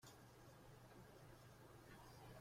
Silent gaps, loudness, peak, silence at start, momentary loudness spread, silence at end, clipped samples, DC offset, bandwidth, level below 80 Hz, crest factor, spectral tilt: none; -64 LUFS; -50 dBFS; 0 s; 3 LU; 0 s; under 0.1%; under 0.1%; 16.5 kHz; -74 dBFS; 14 dB; -5 dB/octave